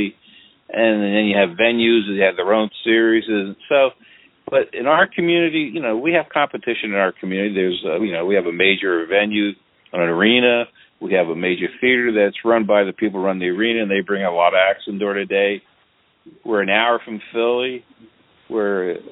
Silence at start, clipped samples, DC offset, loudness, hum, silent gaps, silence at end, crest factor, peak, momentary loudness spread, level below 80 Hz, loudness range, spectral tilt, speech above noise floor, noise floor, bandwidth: 0 s; under 0.1%; under 0.1%; -18 LUFS; none; none; 0.05 s; 18 dB; 0 dBFS; 7 LU; -64 dBFS; 3 LU; -10 dB/octave; 42 dB; -59 dBFS; 4.1 kHz